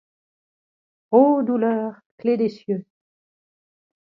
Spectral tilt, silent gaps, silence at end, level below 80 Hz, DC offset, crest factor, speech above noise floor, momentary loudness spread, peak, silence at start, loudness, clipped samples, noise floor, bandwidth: -9.5 dB/octave; 2.06-2.18 s; 1.3 s; -76 dBFS; under 0.1%; 20 dB; over 71 dB; 13 LU; -2 dBFS; 1.1 s; -21 LUFS; under 0.1%; under -90 dBFS; 5.8 kHz